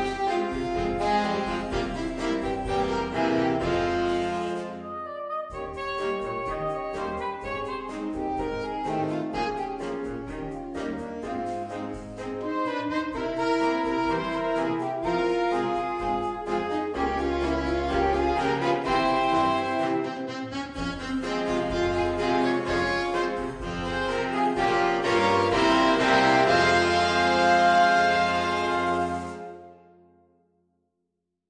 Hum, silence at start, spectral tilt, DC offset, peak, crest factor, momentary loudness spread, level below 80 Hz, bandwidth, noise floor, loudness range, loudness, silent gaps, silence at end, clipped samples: none; 0 s; -5 dB/octave; under 0.1%; -8 dBFS; 18 dB; 12 LU; -46 dBFS; 10 kHz; -80 dBFS; 10 LU; -26 LUFS; none; 1.75 s; under 0.1%